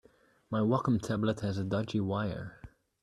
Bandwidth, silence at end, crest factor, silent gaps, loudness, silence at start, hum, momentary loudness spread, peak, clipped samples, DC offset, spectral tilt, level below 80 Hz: 12 kHz; 0.35 s; 18 dB; none; -32 LUFS; 0.5 s; none; 8 LU; -14 dBFS; under 0.1%; under 0.1%; -7.5 dB/octave; -60 dBFS